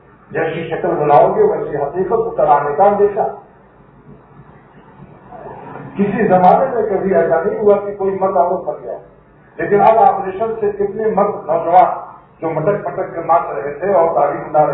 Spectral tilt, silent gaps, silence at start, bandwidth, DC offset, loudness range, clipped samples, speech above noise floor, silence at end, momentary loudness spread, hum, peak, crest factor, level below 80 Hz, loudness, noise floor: -11 dB/octave; none; 0.3 s; 4.1 kHz; under 0.1%; 4 LU; under 0.1%; 31 dB; 0 s; 15 LU; none; 0 dBFS; 16 dB; -50 dBFS; -15 LUFS; -45 dBFS